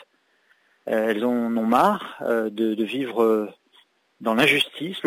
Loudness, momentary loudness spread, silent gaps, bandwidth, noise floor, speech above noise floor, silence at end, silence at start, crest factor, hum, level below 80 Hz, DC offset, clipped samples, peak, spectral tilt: -22 LUFS; 9 LU; none; 16 kHz; -64 dBFS; 42 dB; 0 s; 0.85 s; 16 dB; none; -72 dBFS; under 0.1%; under 0.1%; -6 dBFS; -5 dB/octave